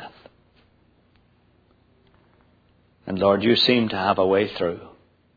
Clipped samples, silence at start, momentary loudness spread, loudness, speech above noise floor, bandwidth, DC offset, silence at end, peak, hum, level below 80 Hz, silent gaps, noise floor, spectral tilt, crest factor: under 0.1%; 0 s; 20 LU; -20 LUFS; 40 dB; 5 kHz; under 0.1%; 0.5 s; -4 dBFS; 60 Hz at -50 dBFS; -60 dBFS; none; -60 dBFS; -6.5 dB/octave; 22 dB